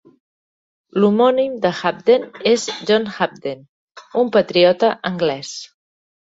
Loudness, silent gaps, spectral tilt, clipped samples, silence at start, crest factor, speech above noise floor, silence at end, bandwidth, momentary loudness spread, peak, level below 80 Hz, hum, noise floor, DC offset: -17 LUFS; 3.69-3.88 s; -5 dB/octave; under 0.1%; 0.95 s; 16 dB; over 73 dB; 0.55 s; 8 kHz; 14 LU; -2 dBFS; -62 dBFS; none; under -90 dBFS; under 0.1%